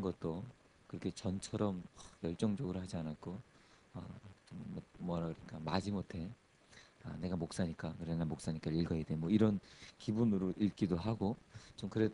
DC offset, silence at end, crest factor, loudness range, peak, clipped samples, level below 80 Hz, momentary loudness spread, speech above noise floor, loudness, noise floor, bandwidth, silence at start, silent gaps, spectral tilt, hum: under 0.1%; 0 s; 20 dB; 8 LU; -18 dBFS; under 0.1%; -62 dBFS; 17 LU; 24 dB; -39 LUFS; -63 dBFS; 10.5 kHz; 0 s; none; -7 dB/octave; none